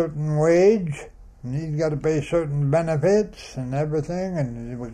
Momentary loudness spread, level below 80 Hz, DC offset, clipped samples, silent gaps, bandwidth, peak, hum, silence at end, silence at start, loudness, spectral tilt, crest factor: 14 LU; -46 dBFS; under 0.1%; under 0.1%; none; 10 kHz; -6 dBFS; none; 0 s; 0 s; -22 LUFS; -7.5 dB/octave; 16 dB